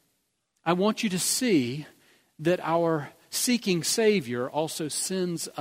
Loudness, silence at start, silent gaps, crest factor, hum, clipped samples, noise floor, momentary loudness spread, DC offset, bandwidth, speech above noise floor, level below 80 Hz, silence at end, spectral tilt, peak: -26 LUFS; 0.65 s; none; 20 dB; none; under 0.1%; -75 dBFS; 8 LU; under 0.1%; 16 kHz; 49 dB; -70 dBFS; 0 s; -4 dB/octave; -8 dBFS